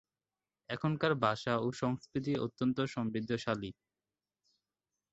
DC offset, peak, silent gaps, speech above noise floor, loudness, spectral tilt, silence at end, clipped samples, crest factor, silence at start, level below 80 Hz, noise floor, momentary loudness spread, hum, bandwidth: under 0.1%; -14 dBFS; none; over 56 dB; -35 LUFS; -5.5 dB/octave; 1.4 s; under 0.1%; 22 dB; 0.7 s; -68 dBFS; under -90 dBFS; 6 LU; none; 8 kHz